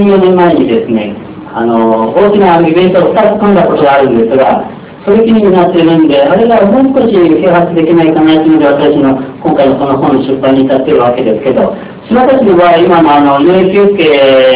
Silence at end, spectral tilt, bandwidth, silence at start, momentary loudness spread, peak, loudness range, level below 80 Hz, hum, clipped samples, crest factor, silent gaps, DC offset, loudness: 0 s; -10.5 dB/octave; 4 kHz; 0 s; 6 LU; 0 dBFS; 2 LU; -40 dBFS; none; 6%; 6 dB; none; under 0.1%; -7 LUFS